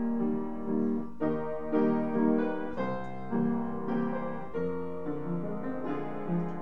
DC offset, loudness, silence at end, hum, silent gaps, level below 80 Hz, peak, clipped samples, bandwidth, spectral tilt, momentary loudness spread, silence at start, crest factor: 1%; -32 LUFS; 0 s; none; none; -60 dBFS; -14 dBFS; under 0.1%; 5.2 kHz; -10 dB/octave; 8 LU; 0 s; 18 dB